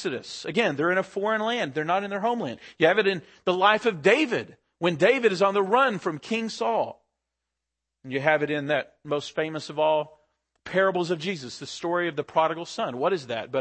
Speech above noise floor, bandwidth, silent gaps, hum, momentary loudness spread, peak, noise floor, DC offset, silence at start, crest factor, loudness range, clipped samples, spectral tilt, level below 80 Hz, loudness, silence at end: 60 dB; 8.8 kHz; none; none; 10 LU; -6 dBFS; -85 dBFS; under 0.1%; 0 s; 20 dB; 5 LU; under 0.1%; -5 dB/octave; -72 dBFS; -25 LUFS; 0 s